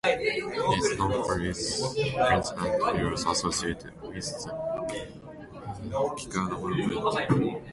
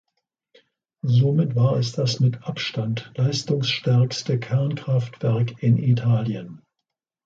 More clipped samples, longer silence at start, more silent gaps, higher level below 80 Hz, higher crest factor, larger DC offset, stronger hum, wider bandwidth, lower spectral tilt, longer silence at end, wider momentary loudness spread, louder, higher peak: neither; second, 0.05 s vs 1.05 s; neither; first, -48 dBFS vs -58 dBFS; about the same, 18 dB vs 14 dB; neither; neither; first, 11.5 kHz vs 7.6 kHz; second, -4.5 dB/octave vs -6.5 dB/octave; second, 0 s vs 0.7 s; first, 13 LU vs 8 LU; second, -28 LUFS vs -22 LUFS; about the same, -10 dBFS vs -8 dBFS